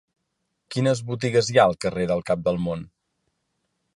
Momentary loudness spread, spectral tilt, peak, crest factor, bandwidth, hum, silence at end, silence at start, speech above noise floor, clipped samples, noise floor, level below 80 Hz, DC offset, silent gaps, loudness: 10 LU; -5.5 dB/octave; -4 dBFS; 20 dB; 11.5 kHz; none; 1.1 s; 0.7 s; 55 dB; under 0.1%; -77 dBFS; -54 dBFS; under 0.1%; none; -23 LUFS